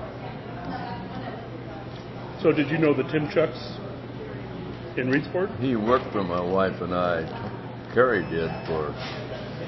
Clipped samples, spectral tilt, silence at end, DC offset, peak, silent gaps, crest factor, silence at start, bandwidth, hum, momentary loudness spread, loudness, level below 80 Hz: under 0.1%; -8 dB/octave; 0 s; under 0.1%; -6 dBFS; none; 20 dB; 0 s; 6 kHz; none; 14 LU; -27 LUFS; -50 dBFS